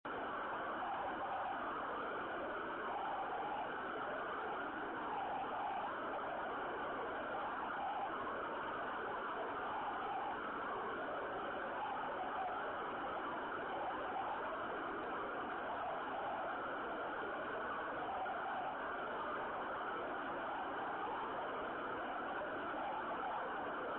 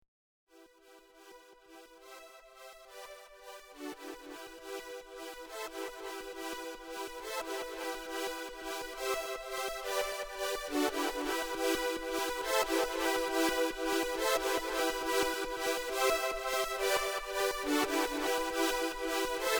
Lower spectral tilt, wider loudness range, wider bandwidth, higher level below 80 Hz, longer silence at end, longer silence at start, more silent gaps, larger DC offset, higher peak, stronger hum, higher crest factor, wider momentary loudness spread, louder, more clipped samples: about the same, -2 dB/octave vs -1 dB/octave; second, 0 LU vs 17 LU; second, 4.3 kHz vs over 20 kHz; second, -70 dBFS vs -58 dBFS; about the same, 0 s vs 0 s; second, 0.05 s vs 0.55 s; neither; neither; second, -32 dBFS vs -16 dBFS; neither; second, 10 dB vs 20 dB; second, 1 LU vs 17 LU; second, -42 LUFS vs -34 LUFS; neither